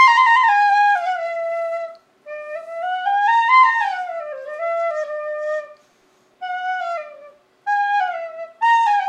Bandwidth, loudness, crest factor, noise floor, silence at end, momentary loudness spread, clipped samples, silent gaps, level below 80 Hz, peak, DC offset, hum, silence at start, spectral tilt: 10 kHz; -18 LUFS; 16 dB; -58 dBFS; 0 s; 18 LU; under 0.1%; none; -88 dBFS; -2 dBFS; under 0.1%; none; 0 s; 1 dB/octave